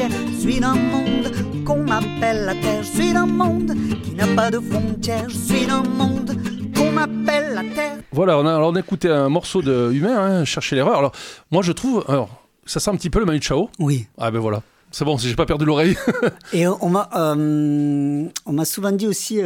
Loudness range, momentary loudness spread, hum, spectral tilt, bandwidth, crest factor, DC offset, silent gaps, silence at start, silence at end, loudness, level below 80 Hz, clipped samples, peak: 2 LU; 6 LU; none; -5.5 dB/octave; 18 kHz; 16 dB; under 0.1%; none; 0 s; 0 s; -20 LUFS; -40 dBFS; under 0.1%; -2 dBFS